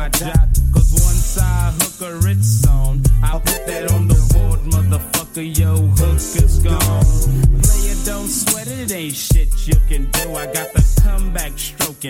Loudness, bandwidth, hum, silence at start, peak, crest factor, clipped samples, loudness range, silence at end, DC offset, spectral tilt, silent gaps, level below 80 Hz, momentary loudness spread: -16 LUFS; 17 kHz; none; 0 s; -2 dBFS; 12 dB; under 0.1%; 2 LU; 0 s; under 0.1%; -4.5 dB/octave; none; -16 dBFS; 7 LU